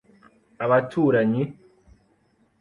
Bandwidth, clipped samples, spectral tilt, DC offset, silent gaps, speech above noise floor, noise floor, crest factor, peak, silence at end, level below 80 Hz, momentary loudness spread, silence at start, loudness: 10 kHz; under 0.1%; -9 dB/octave; under 0.1%; none; 43 dB; -64 dBFS; 18 dB; -6 dBFS; 1.1 s; -62 dBFS; 10 LU; 0.6 s; -22 LUFS